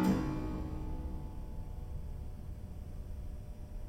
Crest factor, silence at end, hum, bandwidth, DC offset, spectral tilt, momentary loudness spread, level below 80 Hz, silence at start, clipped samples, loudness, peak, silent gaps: 18 dB; 0 s; none; 16.5 kHz; under 0.1%; -7.5 dB/octave; 10 LU; -42 dBFS; 0 s; under 0.1%; -42 LUFS; -20 dBFS; none